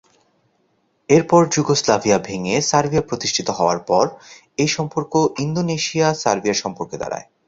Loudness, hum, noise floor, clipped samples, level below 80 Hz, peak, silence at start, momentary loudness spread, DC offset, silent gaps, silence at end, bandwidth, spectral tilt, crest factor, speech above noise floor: -19 LUFS; none; -65 dBFS; under 0.1%; -52 dBFS; 0 dBFS; 1.1 s; 8 LU; under 0.1%; none; 0.25 s; 8 kHz; -4.5 dB/octave; 18 dB; 46 dB